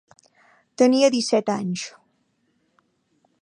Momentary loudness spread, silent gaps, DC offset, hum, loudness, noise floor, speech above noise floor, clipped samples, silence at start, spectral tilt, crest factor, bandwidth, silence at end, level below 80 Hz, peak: 14 LU; none; under 0.1%; none; -21 LUFS; -69 dBFS; 49 dB; under 0.1%; 0.8 s; -4.5 dB/octave; 20 dB; 11 kHz; 1.5 s; -74 dBFS; -6 dBFS